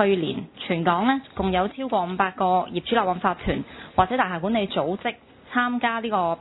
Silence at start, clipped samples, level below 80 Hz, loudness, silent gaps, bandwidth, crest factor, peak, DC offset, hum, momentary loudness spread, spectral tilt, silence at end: 0 s; under 0.1%; -48 dBFS; -24 LUFS; none; 4.1 kHz; 22 dB; -2 dBFS; under 0.1%; none; 7 LU; -10 dB/octave; 0 s